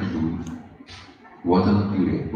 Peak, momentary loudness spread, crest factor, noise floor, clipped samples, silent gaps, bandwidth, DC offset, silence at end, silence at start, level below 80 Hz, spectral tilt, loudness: -6 dBFS; 23 LU; 16 dB; -45 dBFS; under 0.1%; none; 7.2 kHz; under 0.1%; 0 s; 0 s; -46 dBFS; -8.5 dB/octave; -23 LUFS